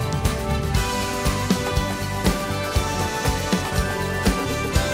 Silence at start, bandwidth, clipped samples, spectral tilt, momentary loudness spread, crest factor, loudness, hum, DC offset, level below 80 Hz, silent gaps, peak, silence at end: 0 s; 16 kHz; under 0.1%; -4.5 dB/octave; 2 LU; 18 dB; -23 LUFS; none; under 0.1%; -30 dBFS; none; -4 dBFS; 0 s